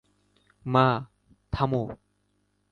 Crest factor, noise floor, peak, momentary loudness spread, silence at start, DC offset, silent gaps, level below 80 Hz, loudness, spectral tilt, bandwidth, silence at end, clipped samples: 22 dB; -72 dBFS; -6 dBFS; 22 LU; 0.65 s; under 0.1%; none; -50 dBFS; -26 LUFS; -8.5 dB/octave; 6.8 kHz; 0.75 s; under 0.1%